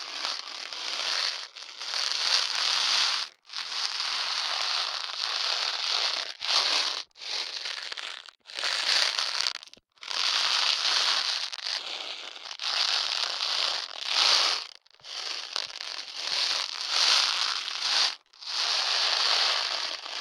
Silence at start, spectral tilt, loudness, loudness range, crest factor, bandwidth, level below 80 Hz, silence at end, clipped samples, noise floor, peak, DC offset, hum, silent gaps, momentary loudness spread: 0 s; 3.5 dB/octave; -26 LUFS; 3 LU; 24 dB; 18 kHz; -86 dBFS; 0 s; under 0.1%; -49 dBFS; -6 dBFS; under 0.1%; none; none; 12 LU